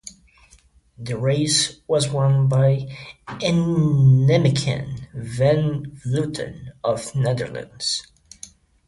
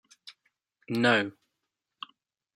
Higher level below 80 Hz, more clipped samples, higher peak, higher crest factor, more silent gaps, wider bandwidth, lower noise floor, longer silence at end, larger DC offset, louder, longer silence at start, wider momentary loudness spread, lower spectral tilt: first, -50 dBFS vs -80 dBFS; neither; first, -6 dBFS vs -10 dBFS; second, 16 dB vs 22 dB; neither; second, 11.5 kHz vs 15.5 kHz; second, -54 dBFS vs -84 dBFS; second, 0.4 s vs 1.25 s; neither; first, -20 LUFS vs -27 LUFS; second, 0.05 s vs 0.25 s; second, 19 LU vs 22 LU; about the same, -5.5 dB/octave vs -5 dB/octave